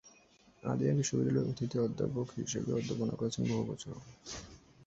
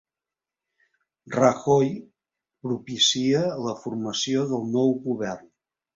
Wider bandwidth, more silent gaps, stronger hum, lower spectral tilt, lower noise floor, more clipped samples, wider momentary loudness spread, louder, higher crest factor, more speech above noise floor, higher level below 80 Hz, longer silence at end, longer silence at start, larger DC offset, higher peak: about the same, 8.2 kHz vs 7.8 kHz; neither; neither; first, -6 dB/octave vs -4.5 dB/octave; second, -64 dBFS vs -90 dBFS; neither; about the same, 14 LU vs 12 LU; second, -35 LUFS vs -24 LUFS; about the same, 16 dB vs 20 dB; second, 30 dB vs 66 dB; about the same, -62 dBFS vs -64 dBFS; second, 0.05 s vs 0.55 s; second, 0.05 s vs 1.25 s; neither; second, -18 dBFS vs -6 dBFS